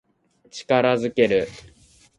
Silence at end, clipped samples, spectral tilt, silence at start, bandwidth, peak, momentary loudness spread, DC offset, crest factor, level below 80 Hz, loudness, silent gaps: 0.6 s; under 0.1%; -5.5 dB/octave; 0.55 s; 11 kHz; -4 dBFS; 18 LU; under 0.1%; 20 dB; -56 dBFS; -20 LUFS; none